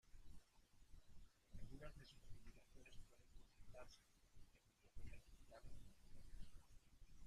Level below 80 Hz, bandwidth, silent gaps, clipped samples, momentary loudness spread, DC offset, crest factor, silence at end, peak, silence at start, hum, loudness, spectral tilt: -64 dBFS; 14 kHz; none; under 0.1%; 7 LU; under 0.1%; 16 dB; 0 s; -42 dBFS; 0.05 s; none; -66 LUFS; -5 dB/octave